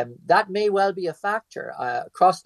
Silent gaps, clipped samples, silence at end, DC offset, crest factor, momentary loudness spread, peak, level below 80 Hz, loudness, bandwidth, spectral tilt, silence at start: none; under 0.1%; 0.05 s; under 0.1%; 18 dB; 9 LU; -4 dBFS; -74 dBFS; -23 LUFS; 12.5 kHz; -5 dB/octave; 0 s